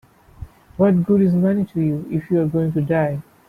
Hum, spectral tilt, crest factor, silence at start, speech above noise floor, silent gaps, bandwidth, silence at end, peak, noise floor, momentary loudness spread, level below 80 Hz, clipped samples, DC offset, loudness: none; -10.5 dB/octave; 14 dB; 0.4 s; 21 dB; none; 3.9 kHz; 0.3 s; -6 dBFS; -39 dBFS; 7 LU; -48 dBFS; under 0.1%; under 0.1%; -19 LUFS